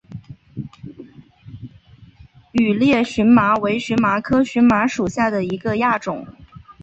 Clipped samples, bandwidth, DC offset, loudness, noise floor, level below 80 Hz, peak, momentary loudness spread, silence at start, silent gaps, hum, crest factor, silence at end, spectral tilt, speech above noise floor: under 0.1%; 8.2 kHz; under 0.1%; -17 LUFS; -47 dBFS; -48 dBFS; -2 dBFS; 24 LU; 0.1 s; none; none; 16 dB; 0.1 s; -6 dB/octave; 30 dB